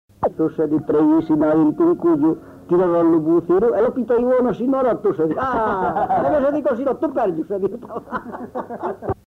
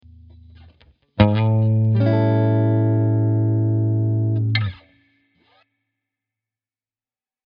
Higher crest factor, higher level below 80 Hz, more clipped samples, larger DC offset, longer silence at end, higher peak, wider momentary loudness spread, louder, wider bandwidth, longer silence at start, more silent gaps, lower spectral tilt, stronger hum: second, 10 dB vs 20 dB; about the same, -50 dBFS vs -46 dBFS; neither; neither; second, 0.15 s vs 2.75 s; second, -8 dBFS vs 0 dBFS; first, 12 LU vs 3 LU; about the same, -19 LUFS vs -19 LUFS; second, 4.2 kHz vs 5 kHz; second, 0.2 s vs 1.15 s; neither; first, -9.5 dB/octave vs -7.5 dB/octave; neither